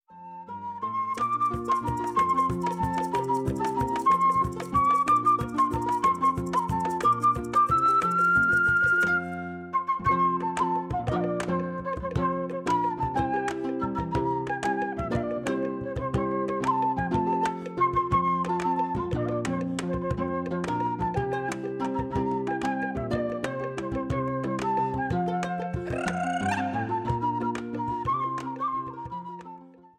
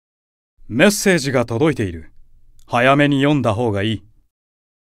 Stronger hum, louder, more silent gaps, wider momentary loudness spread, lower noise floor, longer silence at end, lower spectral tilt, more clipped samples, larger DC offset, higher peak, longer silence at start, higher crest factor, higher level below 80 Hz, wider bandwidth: neither; second, -27 LUFS vs -17 LUFS; neither; second, 9 LU vs 12 LU; about the same, -47 dBFS vs -44 dBFS; second, 0.1 s vs 0.95 s; first, -6.5 dB/octave vs -5 dB/octave; neither; neither; second, -14 dBFS vs 0 dBFS; second, 0.1 s vs 0.65 s; about the same, 14 dB vs 18 dB; about the same, -46 dBFS vs -46 dBFS; about the same, 15.5 kHz vs 16 kHz